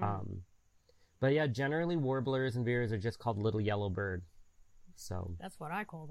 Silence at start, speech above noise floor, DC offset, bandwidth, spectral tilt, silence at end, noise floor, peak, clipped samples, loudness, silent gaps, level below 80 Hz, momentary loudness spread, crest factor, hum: 0 s; 33 dB; under 0.1%; 14 kHz; -7 dB/octave; 0 s; -67 dBFS; -20 dBFS; under 0.1%; -35 LUFS; none; -60 dBFS; 13 LU; 16 dB; none